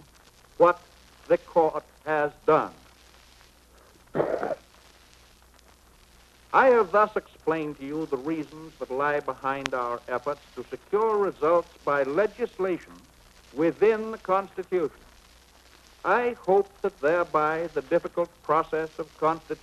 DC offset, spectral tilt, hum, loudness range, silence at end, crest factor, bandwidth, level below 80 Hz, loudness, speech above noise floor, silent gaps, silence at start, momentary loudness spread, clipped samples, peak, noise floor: under 0.1%; -6 dB/octave; none; 5 LU; 0.05 s; 24 dB; 13 kHz; -60 dBFS; -26 LUFS; 30 dB; none; 0.6 s; 11 LU; under 0.1%; -4 dBFS; -56 dBFS